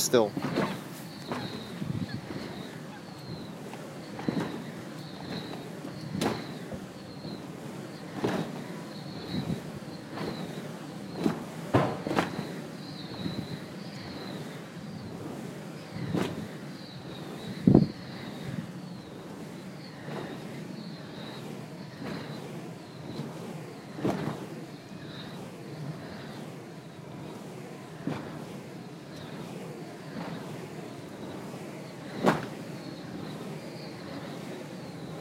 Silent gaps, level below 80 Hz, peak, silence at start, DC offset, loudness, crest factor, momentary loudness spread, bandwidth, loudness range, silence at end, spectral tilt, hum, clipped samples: none; -62 dBFS; -4 dBFS; 0 s; under 0.1%; -36 LUFS; 32 dB; 12 LU; 16 kHz; 10 LU; 0 s; -5.5 dB/octave; none; under 0.1%